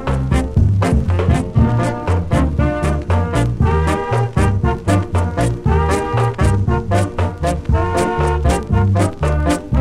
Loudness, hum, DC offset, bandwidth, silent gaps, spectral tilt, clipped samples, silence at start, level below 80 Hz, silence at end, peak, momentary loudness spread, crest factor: -17 LUFS; none; under 0.1%; 12.5 kHz; none; -7 dB/octave; under 0.1%; 0 s; -22 dBFS; 0 s; -2 dBFS; 3 LU; 14 dB